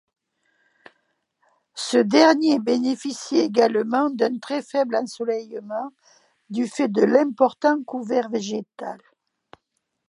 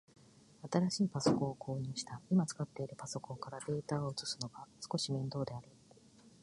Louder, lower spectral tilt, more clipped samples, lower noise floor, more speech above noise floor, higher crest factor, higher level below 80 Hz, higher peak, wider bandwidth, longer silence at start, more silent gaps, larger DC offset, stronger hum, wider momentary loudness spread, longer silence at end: first, -22 LUFS vs -38 LUFS; about the same, -4.5 dB/octave vs -5.5 dB/octave; neither; first, -76 dBFS vs -63 dBFS; first, 55 dB vs 25 dB; about the same, 22 dB vs 22 dB; second, -78 dBFS vs -70 dBFS; first, -2 dBFS vs -16 dBFS; about the same, 11.5 kHz vs 11.5 kHz; first, 1.75 s vs 0.65 s; neither; neither; neither; first, 14 LU vs 11 LU; first, 1.15 s vs 0.15 s